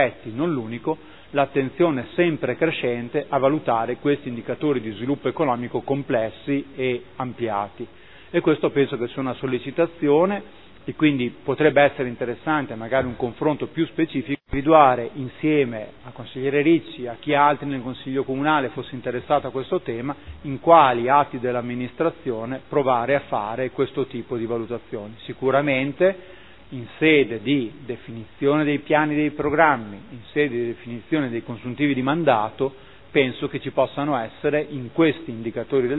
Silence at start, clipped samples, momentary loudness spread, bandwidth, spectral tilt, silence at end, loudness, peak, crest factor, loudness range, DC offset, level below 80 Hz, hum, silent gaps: 0 s; under 0.1%; 12 LU; 4.1 kHz; -10.5 dB/octave; 0 s; -22 LUFS; 0 dBFS; 22 dB; 4 LU; 0.4%; -52 dBFS; none; none